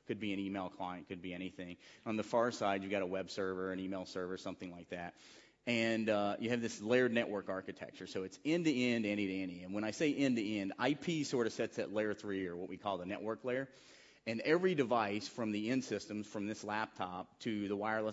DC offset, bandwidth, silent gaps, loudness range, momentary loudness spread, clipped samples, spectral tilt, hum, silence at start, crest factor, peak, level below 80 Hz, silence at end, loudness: under 0.1%; 7.6 kHz; none; 3 LU; 12 LU; under 0.1%; -4 dB/octave; none; 0.1 s; 20 dB; -18 dBFS; -76 dBFS; 0 s; -38 LUFS